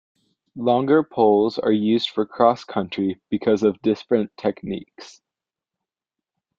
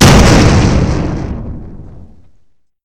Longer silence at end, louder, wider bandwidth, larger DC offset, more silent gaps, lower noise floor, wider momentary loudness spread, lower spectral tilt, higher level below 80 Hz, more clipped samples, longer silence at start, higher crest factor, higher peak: first, 1.5 s vs 0.9 s; second, -21 LUFS vs -10 LUFS; second, 7.4 kHz vs 17.5 kHz; neither; neither; first, -88 dBFS vs -50 dBFS; second, 9 LU vs 22 LU; first, -7 dB/octave vs -5 dB/octave; second, -64 dBFS vs -18 dBFS; second, under 0.1% vs 1%; first, 0.55 s vs 0 s; first, 20 dB vs 10 dB; about the same, -2 dBFS vs 0 dBFS